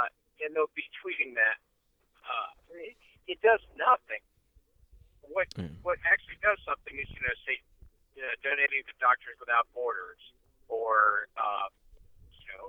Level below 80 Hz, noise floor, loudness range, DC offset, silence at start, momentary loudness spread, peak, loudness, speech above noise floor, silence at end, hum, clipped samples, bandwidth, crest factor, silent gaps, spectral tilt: -60 dBFS; -72 dBFS; 3 LU; under 0.1%; 0 s; 15 LU; -10 dBFS; -30 LUFS; 42 dB; 0 s; none; under 0.1%; 8.4 kHz; 22 dB; none; -5 dB/octave